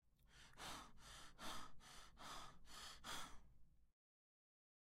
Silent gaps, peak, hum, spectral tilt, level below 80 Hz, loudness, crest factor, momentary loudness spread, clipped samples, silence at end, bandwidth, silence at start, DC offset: none; -38 dBFS; none; -1.5 dB/octave; -68 dBFS; -57 LUFS; 18 dB; 9 LU; under 0.1%; 1.05 s; 16 kHz; 0.05 s; under 0.1%